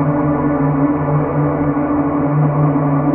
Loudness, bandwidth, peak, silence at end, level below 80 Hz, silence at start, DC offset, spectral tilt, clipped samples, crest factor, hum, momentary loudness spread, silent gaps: -16 LUFS; 2.9 kHz; -4 dBFS; 0 s; -38 dBFS; 0 s; under 0.1%; -11 dB/octave; under 0.1%; 10 dB; none; 2 LU; none